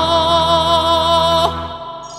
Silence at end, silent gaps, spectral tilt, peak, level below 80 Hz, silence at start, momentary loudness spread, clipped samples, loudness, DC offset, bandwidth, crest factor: 0 s; none; -4 dB/octave; 0 dBFS; -34 dBFS; 0 s; 13 LU; under 0.1%; -13 LUFS; under 0.1%; 15.5 kHz; 14 dB